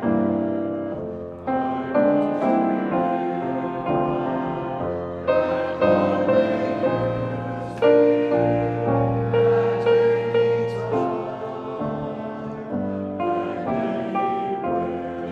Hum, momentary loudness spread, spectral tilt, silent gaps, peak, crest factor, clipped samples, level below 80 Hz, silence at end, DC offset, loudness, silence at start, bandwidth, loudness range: none; 10 LU; -9 dB/octave; none; -6 dBFS; 16 dB; under 0.1%; -52 dBFS; 0 s; under 0.1%; -23 LUFS; 0 s; 7.2 kHz; 6 LU